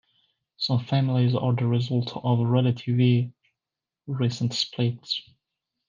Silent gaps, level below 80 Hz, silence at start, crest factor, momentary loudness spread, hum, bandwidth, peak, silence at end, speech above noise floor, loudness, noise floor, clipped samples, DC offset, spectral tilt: none; -68 dBFS; 0.6 s; 16 dB; 9 LU; none; 7.4 kHz; -8 dBFS; 0.7 s; 65 dB; -25 LUFS; -89 dBFS; under 0.1%; under 0.1%; -7 dB/octave